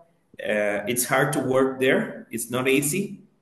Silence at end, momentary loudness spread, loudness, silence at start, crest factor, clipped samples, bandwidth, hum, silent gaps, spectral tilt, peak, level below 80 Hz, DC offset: 0.25 s; 11 LU; -23 LUFS; 0.4 s; 18 dB; under 0.1%; 13 kHz; none; none; -4 dB/octave; -6 dBFS; -66 dBFS; under 0.1%